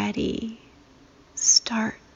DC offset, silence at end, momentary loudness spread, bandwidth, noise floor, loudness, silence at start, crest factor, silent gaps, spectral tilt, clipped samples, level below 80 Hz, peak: under 0.1%; 0.2 s; 18 LU; 7.6 kHz; -54 dBFS; -22 LUFS; 0 s; 22 dB; none; -1.5 dB/octave; under 0.1%; -52 dBFS; -6 dBFS